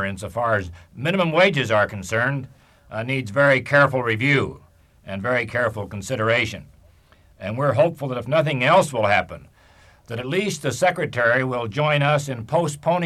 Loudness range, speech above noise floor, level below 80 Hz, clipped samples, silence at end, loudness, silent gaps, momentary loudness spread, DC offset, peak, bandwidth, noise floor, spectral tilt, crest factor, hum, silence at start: 4 LU; 33 dB; -54 dBFS; under 0.1%; 0 s; -21 LUFS; none; 14 LU; under 0.1%; -4 dBFS; 13.5 kHz; -54 dBFS; -5.5 dB/octave; 18 dB; none; 0 s